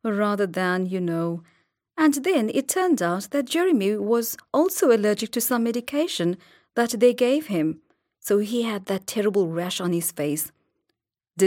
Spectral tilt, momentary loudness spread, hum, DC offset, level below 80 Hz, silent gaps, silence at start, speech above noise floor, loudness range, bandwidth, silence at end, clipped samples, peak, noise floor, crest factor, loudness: -4.5 dB/octave; 9 LU; none; under 0.1%; -72 dBFS; none; 0.05 s; 56 dB; 3 LU; 17 kHz; 0 s; under 0.1%; -6 dBFS; -79 dBFS; 16 dB; -23 LUFS